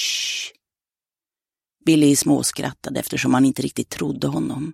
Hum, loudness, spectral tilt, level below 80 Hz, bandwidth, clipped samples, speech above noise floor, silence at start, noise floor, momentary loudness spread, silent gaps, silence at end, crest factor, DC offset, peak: none; -20 LUFS; -4 dB/octave; -56 dBFS; 16 kHz; under 0.1%; over 70 dB; 0 s; under -90 dBFS; 12 LU; none; 0 s; 18 dB; under 0.1%; -4 dBFS